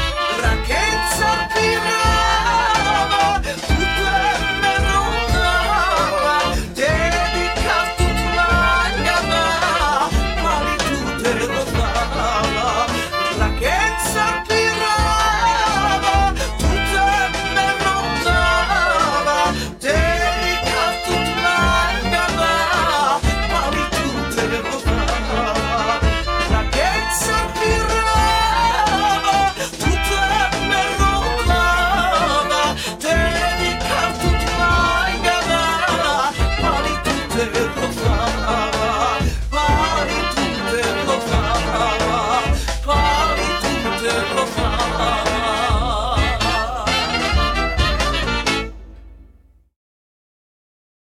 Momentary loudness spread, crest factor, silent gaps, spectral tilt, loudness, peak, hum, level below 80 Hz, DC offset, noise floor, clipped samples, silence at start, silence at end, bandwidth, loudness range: 4 LU; 14 dB; none; -3.5 dB/octave; -17 LUFS; -2 dBFS; none; -26 dBFS; under 0.1%; -50 dBFS; under 0.1%; 0 s; 1.8 s; 17 kHz; 2 LU